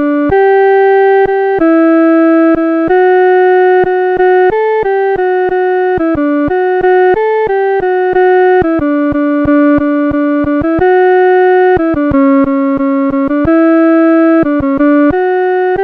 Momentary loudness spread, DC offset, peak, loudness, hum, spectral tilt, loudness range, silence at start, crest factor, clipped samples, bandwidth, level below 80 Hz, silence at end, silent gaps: 4 LU; 0.1%; -2 dBFS; -9 LUFS; none; -9 dB/octave; 2 LU; 0 s; 8 dB; under 0.1%; 4.7 kHz; -36 dBFS; 0 s; none